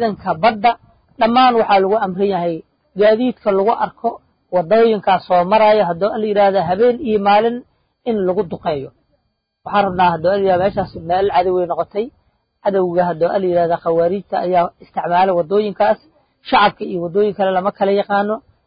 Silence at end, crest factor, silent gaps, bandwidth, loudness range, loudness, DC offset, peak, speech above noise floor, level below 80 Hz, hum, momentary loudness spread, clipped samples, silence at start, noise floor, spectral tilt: 0.25 s; 16 dB; none; 5.2 kHz; 3 LU; -16 LUFS; under 0.1%; 0 dBFS; 53 dB; -50 dBFS; none; 10 LU; under 0.1%; 0 s; -68 dBFS; -11 dB/octave